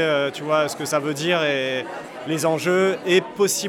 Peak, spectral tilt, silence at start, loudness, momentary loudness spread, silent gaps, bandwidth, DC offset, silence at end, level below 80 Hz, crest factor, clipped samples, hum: -6 dBFS; -3.5 dB/octave; 0 s; -21 LUFS; 8 LU; none; 18 kHz; under 0.1%; 0 s; -68 dBFS; 16 dB; under 0.1%; none